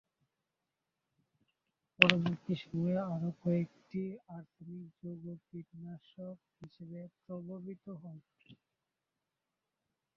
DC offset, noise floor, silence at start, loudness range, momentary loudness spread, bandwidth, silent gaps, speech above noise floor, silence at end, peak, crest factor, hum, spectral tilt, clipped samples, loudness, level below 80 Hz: under 0.1%; -89 dBFS; 2 s; 17 LU; 23 LU; 7.2 kHz; none; 51 dB; 1.65 s; -2 dBFS; 38 dB; none; -4 dB/octave; under 0.1%; -33 LUFS; -74 dBFS